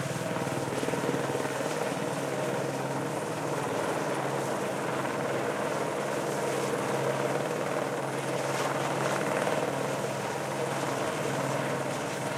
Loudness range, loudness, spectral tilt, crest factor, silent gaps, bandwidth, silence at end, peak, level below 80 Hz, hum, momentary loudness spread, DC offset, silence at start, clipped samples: 1 LU; -31 LUFS; -4.5 dB/octave; 18 dB; none; 16.5 kHz; 0 s; -12 dBFS; -72 dBFS; none; 3 LU; under 0.1%; 0 s; under 0.1%